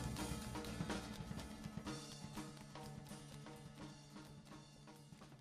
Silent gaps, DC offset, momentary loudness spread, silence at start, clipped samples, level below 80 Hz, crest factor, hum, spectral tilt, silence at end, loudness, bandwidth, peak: none; under 0.1%; 13 LU; 0 s; under 0.1%; -60 dBFS; 18 dB; none; -4.5 dB/octave; 0 s; -51 LUFS; 15.5 kHz; -32 dBFS